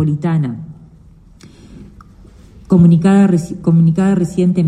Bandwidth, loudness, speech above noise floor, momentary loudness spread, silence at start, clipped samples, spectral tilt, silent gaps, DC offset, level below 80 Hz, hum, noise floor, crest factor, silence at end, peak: 9.8 kHz; -13 LUFS; 31 dB; 11 LU; 0 s; under 0.1%; -9 dB/octave; none; under 0.1%; -44 dBFS; none; -42 dBFS; 12 dB; 0 s; -2 dBFS